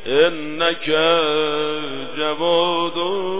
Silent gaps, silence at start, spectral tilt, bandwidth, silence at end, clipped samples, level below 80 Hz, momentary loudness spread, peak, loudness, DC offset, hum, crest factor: none; 0 s; -8 dB/octave; 4 kHz; 0 s; under 0.1%; -62 dBFS; 8 LU; -2 dBFS; -19 LUFS; 3%; none; 16 dB